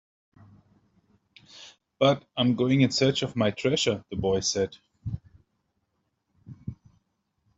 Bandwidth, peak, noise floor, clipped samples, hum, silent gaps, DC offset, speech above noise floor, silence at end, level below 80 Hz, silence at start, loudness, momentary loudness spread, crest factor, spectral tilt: 8.2 kHz; -8 dBFS; -77 dBFS; under 0.1%; none; none; under 0.1%; 52 dB; 0.85 s; -58 dBFS; 1.55 s; -25 LUFS; 20 LU; 22 dB; -5 dB/octave